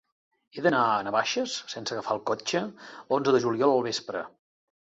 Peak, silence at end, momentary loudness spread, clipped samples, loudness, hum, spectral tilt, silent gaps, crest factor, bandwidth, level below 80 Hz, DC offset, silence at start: -8 dBFS; 0.6 s; 13 LU; under 0.1%; -27 LUFS; none; -4 dB/octave; none; 20 dB; 8 kHz; -72 dBFS; under 0.1%; 0.55 s